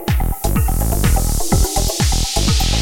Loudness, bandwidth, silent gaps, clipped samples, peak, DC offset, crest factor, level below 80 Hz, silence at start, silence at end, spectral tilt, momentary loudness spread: -17 LUFS; 17 kHz; none; under 0.1%; -2 dBFS; under 0.1%; 12 dB; -18 dBFS; 0 s; 0 s; -4 dB/octave; 3 LU